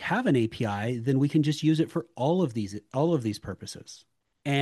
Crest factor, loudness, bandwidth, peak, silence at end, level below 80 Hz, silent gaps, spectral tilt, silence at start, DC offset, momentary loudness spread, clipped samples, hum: 16 dB; -27 LUFS; 12.5 kHz; -12 dBFS; 0 s; -64 dBFS; none; -6.5 dB/octave; 0 s; under 0.1%; 14 LU; under 0.1%; none